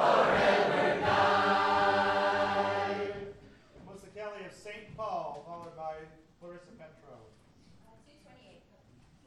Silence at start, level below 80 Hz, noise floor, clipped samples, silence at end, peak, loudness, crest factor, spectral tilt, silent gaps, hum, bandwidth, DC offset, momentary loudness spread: 0 s; -62 dBFS; -61 dBFS; under 0.1%; 2.1 s; -12 dBFS; -28 LUFS; 20 dB; -5 dB/octave; none; none; 12.5 kHz; under 0.1%; 23 LU